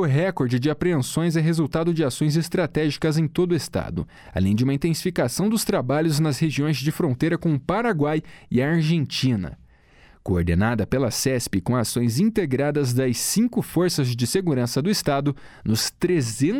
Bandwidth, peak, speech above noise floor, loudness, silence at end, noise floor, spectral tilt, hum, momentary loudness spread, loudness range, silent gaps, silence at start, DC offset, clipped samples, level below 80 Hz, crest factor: 17.5 kHz; -10 dBFS; 30 dB; -22 LUFS; 0 s; -52 dBFS; -5.5 dB/octave; none; 4 LU; 2 LU; none; 0 s; under 0.1%; under 0.1%; -46 dBFS; 12 dB